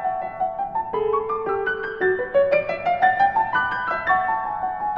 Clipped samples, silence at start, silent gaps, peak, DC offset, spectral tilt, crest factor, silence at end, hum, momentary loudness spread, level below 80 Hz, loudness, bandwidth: under 0.1%; 0 s; none; -6 dBFS; under 0.1%; -6.5 dB/octave; 16 dB; 0 s; none; 7 LU; -52 dBFS; -22 LUFS; 5.8 kHz